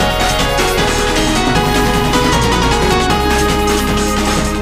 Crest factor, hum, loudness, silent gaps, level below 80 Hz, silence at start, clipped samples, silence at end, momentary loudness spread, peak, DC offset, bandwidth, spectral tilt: 12 dB; none; -13 LUFS; none; -20 dBFS; 0 s; under 0.1%; 0 s; 2 LU; 0 dBFS; under 0.1%; 15.5 kHz; -4 dB/octave